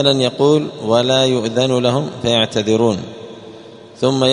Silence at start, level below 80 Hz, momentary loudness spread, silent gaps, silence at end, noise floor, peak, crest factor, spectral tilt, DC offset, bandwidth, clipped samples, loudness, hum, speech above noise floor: 0 s; -54 dBFS; 14 LU; none; 0 s; -37 dBFS; 0 dBFS; 16 dB; -5 dB/octave; under 0.1%; 10.5 kHz; under 0.1%; -16 LUFS; none; 22 dB